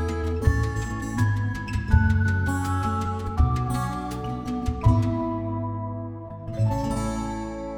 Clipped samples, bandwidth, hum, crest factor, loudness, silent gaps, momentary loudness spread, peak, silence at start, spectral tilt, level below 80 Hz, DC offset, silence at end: under 0.1%; 15 kHz; none; 18 dB; -26 LUFS; none; 9 LU; -6 dBFS; 0 s; -7 dB/octave; -32 dBFS; under 0.1%; 0 s